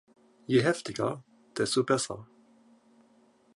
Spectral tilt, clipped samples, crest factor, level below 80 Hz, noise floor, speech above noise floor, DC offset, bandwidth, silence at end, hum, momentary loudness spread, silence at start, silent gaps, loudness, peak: -4.5 dB/octave; under 0.1%; 20 dB; -70 dBFS; -63 dBFS; 35 dB; under 0.1%; 11.5 kHz; 1.3 s; none; 18 LU; 0.5 s; none; -29 LUFS; -12 dBFS